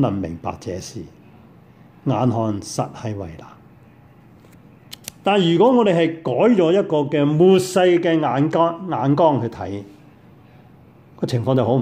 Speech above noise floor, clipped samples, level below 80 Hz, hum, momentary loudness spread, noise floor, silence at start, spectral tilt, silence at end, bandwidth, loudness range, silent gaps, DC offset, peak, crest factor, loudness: 30 dB; under 0.1%; -56 dBFS; none; 16 LU; -47 dBFS; 0 s; -6.5 dB/octave; 0 s; 15.5 kHz; 10 LU; none; under 0.1%; -4 dBFS; 16 dB; -18 LUFS